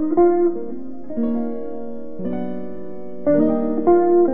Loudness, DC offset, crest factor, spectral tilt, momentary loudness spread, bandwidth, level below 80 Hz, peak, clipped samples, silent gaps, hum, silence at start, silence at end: -20 LUFS; 4%; 16 dB; -11.5 dB/octave; 17 LU; 2.4 kHz; -52 dBFS; -4 dBFS; under 0.1%; none; none; 0 s; 0 s